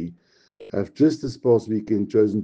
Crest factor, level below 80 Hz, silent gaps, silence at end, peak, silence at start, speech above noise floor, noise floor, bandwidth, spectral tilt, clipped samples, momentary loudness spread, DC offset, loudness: 16 dB; -58 dBFS; none; 0 s; -6 dBFS; 0 s; 33 dB; -53 dBFS; 8.2 kHz; -8 dB/octave; under 0.1%; 10 LU; under 0.1%; -22 LUFS